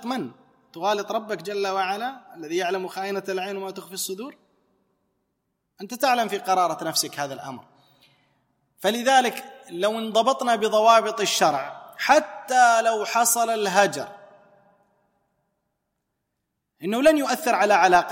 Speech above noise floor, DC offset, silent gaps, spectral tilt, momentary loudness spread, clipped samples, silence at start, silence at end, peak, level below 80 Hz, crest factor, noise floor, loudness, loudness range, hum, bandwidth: 57 dB; under 0.1%; none; -2.5 dB/octave; 17 LU; under 0.1%; 0 s; 0 s; -4 dBFS; -68 dBFS; 20 dB; -79 dBFS; -22 LUFS; 10 LU; none; 16.5 kHz